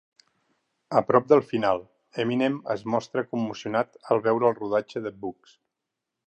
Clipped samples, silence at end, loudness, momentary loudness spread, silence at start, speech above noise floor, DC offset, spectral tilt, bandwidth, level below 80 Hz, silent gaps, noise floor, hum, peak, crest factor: under 0.1%; 1 s; -25 LUFS; 12 LU; 0.9 s; 60 dB; under 0.1%; -7 dB/octave; 8.6 kHz; -68 dBFS; none; -85 dBFS; none; -4 dBFS; 22 dB